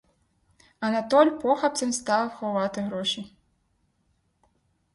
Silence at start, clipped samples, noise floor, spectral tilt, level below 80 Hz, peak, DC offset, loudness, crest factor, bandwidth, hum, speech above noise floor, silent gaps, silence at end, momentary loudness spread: 0.8 s; under 0.1%; -70 dBFS; -3.5 dB/octave; -66 dBFS; -6 dBFS; under 0.1%; -25 LUFS; 20 dB; 11.5 kHz; none; 46 dB; none; 1.65 s; 10 LU